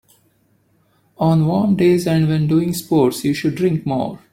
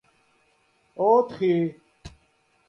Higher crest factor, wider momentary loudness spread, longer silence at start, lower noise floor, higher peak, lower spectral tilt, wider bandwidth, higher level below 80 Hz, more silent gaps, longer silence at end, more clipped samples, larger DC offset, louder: about the same, 16 dB vs 20 dB; second, 6 LU vs 11 LU; first, 1.2 s vs 1 s; second, -60 dBFS vs -66 dBFS; first, -2 dBFS vs -6 dBFS; second, -7 dB/octave vs -8.5 dB/octave; first, 16.5 kHz vs 7 kHz; first, -52 dBFS vs -60 dBFS; neither; second, 0.15 s vs 0.6 s; neither; neither; first, -17 LUFS vs -23 LUFS